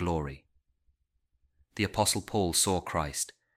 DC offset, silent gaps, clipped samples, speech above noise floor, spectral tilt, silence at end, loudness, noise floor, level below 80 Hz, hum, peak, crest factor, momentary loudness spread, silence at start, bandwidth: under 0.1%; none; under 0.1%; 46 dB; -3.5 dB/octave; 0.3 s; -29 LUFS; -76 dBFS; -50 dBFS; none; -10 dBFS; 22 dB; 9 LU; 0 s; 16 kHz